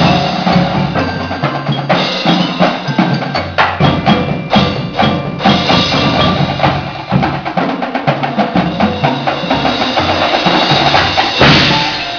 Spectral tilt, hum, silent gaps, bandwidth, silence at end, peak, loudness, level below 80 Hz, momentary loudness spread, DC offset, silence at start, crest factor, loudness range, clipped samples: -5.5 dB/octave; none; none; 5.4 kHz; 0 s; 0 dBFS; -12 LUFS; -36 dBFS; 7 LU; 0.1%; 0 s; 12 dB; 3 LU; under 0.1%